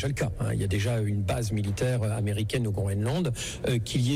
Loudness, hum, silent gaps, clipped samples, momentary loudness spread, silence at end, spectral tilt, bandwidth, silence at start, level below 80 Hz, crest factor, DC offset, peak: -28 LUFS; none; none; under 0.1%; 2 LU; 0 s; -6 dB/octave; 15.5 kHz; 0 s; -44 dBFS; 10 dB; under 0.1%; -16 dBFS